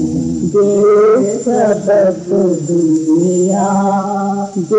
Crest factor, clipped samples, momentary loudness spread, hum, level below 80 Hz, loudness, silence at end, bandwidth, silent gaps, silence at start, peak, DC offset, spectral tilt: 8 dB; under 0.1%; 7 LU; none; -48 dBFS; -13 LUFS; 0 s; 9.8 kHz; none; 0 s; -4 dBFS; under 0.1%; -7 dB/octave